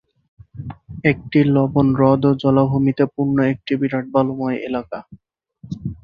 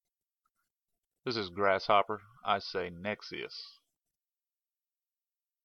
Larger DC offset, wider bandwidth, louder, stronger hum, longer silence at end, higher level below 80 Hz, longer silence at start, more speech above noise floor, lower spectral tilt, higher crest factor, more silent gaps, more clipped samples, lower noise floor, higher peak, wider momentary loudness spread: neither; second, 5.2 kHz vs 6.8 kHz; first, -18 LUFS vs -33 LUFS; neither; second, 0.05 s vs 1.95 s; first, -48 dBFS vs -74 dBFS; second, 0.55 s vs 1.25 s; second, 29 dB vs over 57 dB; first, -10 dB/octave vs -5 dB/octave; second, 16 dB vs 24 dB; neither; neither; second, -46 dBFS vs under -90 dBFS; first, -2 dBFS vs -12 dBFS; first, 18 LU vs 15 LU